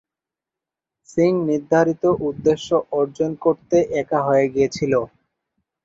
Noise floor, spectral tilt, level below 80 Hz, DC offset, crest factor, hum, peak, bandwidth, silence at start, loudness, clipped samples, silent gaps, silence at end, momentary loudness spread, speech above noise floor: -87 dBFS; -6.5 dB/octave; -54 dBFS; under 0.1%; 18 dB; none; -4 dBFS; 7.8 kHz; 1.15 s; -20 LUFS; under 0.1%; none; 0.8 s; 5 LU; 69 dB